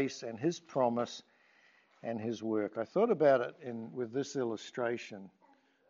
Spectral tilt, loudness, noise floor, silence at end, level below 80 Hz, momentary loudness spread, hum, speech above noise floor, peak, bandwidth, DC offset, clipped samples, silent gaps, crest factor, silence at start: -5 dB/octave; -34 LUFS; -68 dBFS; 0.6 s; -86 dBFS; 15 LU; none; 34 dB; -14 dBFS; 7.6 kHz; under 0.1%; under 0.1%; none; 20 dB; 0 s